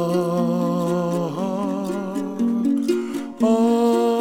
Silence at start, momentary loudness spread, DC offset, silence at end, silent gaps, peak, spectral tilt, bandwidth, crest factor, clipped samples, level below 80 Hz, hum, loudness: 0 s; 8 LU; under 0.1%; 0 s; none; -6 dBFS; -7 dB/octave; 16.5 kHz; 14 dB; under 0.1%; -62 dBFS; none; -21 LUFS